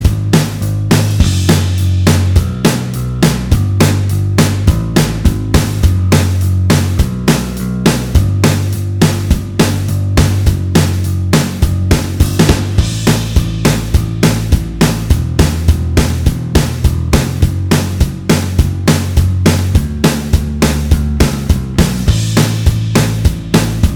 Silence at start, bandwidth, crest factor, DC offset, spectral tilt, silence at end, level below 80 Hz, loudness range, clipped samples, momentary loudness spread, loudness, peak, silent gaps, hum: 0 s; 19 kHz; 12 dB; under 0.1%; -5.5 dB/octave; 0 s; -18 dBFS; 1 LU; 0.3%; 4 LU; -13 LUFS; 0 dBFS; none; none